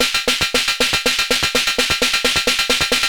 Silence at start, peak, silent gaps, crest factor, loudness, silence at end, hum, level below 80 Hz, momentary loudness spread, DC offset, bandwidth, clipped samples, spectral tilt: 0 s; -4 dBFS; none; 12 dB; -15 LUFS; 0 s; none; -40 dBFS; 1 LU; under 0.1%; 19 kHz; under 0.1%; -0.5 dB/octave